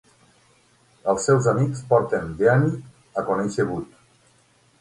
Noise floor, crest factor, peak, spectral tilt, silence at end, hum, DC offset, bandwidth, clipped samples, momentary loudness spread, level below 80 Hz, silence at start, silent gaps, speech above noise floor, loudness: -59 dBFS; 18 dB; -4 dBFS; -6.5 dB/octave; 0.95 s; none; under 0.1%; 11.5 kHz; under 0.1%; 13 LU; -54 dBFS; 1.05 s; none; 39 dB; -22 LUFS